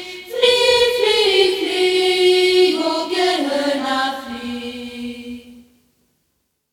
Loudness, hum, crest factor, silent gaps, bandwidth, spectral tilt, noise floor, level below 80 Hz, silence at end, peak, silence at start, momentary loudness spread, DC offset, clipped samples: -16 LUFS; none; 16 dB; none; 17 kHz; -2 dB/octave; -70 dBFS; -54 dBFS; 1.1 s; -2 dBFS; 0 s; 16 LU; under 0.1%; under 0.1%